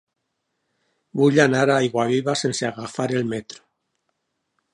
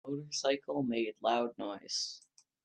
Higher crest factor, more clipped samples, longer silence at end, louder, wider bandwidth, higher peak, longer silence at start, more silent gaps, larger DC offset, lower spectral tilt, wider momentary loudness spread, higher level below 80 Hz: about the same, 22 dB vs 18 dB; neither; first, 1.2 s vs 0.45 s; first, -20 LUFS vs -35 LUFS; about the same, 11.5 kHz vs 10.5 kHz; first, -2 dBFS vs -18 dBFS; first, 1.15 s vs 0.05 s; neither; neither; first, -5 dB/octave vs -3.5 dB/octave; first, 13 LU vs 8 LU; first, -66 dBFS vs -80 dBFS